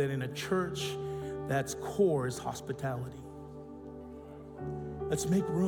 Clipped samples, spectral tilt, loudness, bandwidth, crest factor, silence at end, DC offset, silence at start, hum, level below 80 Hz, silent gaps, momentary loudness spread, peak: under 0.1%; -5.5 dB/octave; -34 LUFS; 18 kHz; 18 dB; 0 s; under 0.1%; 0 s; none; -58 dBFS; none; 17 LU; -16 dBFS